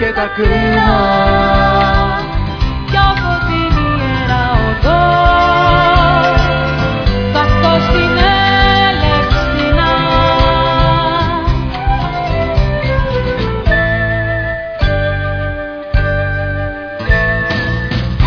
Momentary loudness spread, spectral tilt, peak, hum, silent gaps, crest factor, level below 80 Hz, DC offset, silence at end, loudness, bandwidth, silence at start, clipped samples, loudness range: 8 LU; -7 dB/octave; 0 dBFS; none; none; 12 dB; -18 dBFS; under 0.1%; 0 s; -13 LUFS; 5.4 kHz; 0 s; under 0.1%; 5 LU